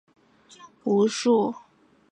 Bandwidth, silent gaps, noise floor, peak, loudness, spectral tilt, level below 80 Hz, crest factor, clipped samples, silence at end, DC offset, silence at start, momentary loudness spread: 11 kHz; none; -52 dBFS; -10 dBFS; -24 LUFS; -5 dB/octave; -74 dBFS; 16 dB; under 0.1%; 0.55 s; under 0.1%; 0.65 s; 13 LU